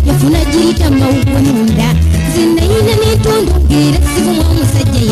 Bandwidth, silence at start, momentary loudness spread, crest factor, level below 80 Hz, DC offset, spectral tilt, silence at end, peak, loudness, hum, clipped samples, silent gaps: 15 kHz; 0 s; 1 LU; 10 dB; -16 dBFS; under 0.1%; -6 dB/octave; 0 s; 0 dBFS; -10 LUFS; none; under 0.1%; none